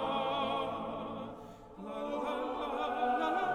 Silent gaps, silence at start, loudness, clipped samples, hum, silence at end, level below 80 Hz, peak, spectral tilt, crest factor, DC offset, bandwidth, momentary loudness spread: none; 0 s; -36 LUFS; under 0.1%; none; 0 s; -62 dBFS; -22 dBFS; -5.5 dB/octave; 14 dB; under 0.1%; 13.5 kHz; 14 LU